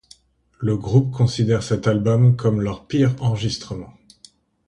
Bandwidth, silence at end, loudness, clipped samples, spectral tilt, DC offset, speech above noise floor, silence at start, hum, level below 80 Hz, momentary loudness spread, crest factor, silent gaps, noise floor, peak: 9.8 kHz; 0.75 s; -20 LUFS; under 0.1%; -7.5 dB/octave; under 0.1%; 34 dB; 0.6 s; none; -46 dBFS; 11 LU; 16 dB; none; -52 dBFS; -4 dBFS